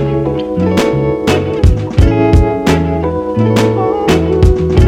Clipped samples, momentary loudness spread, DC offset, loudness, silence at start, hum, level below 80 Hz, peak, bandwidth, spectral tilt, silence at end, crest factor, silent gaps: under 0.1%; 5 LU; under 0.1%; -12 LUFS; 0 s; none; -18 dBFS; 0 dBFS; 14.5 kHz; -7 dB/octave; 0 s; 10 dB; none